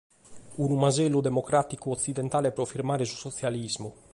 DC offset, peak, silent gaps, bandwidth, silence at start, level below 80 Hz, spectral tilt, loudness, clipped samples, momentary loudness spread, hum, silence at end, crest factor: under 0.1%; -10 dBFS; none; 11.5 kHz; 0.3 s; -60 dBFS; -5.5 dB/octave; -28 LUFS; under 0.1%; 8 LU; none; 0.2 s; 18 dB